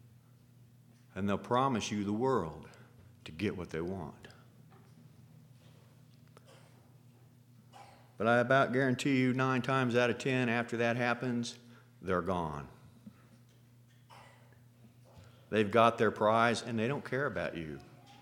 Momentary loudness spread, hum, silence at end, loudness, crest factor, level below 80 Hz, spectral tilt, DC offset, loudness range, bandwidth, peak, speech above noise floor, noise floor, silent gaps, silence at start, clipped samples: 18 LU; none; 0.25 s; -32 LUFS; 24 dB; -66 dBFS; -6 dB/octave; under 0.1%; 13 LU; 16 kHz; -12 dBFS; 30 dB; -61 dBFS; none; 1.15 s; under 0.1%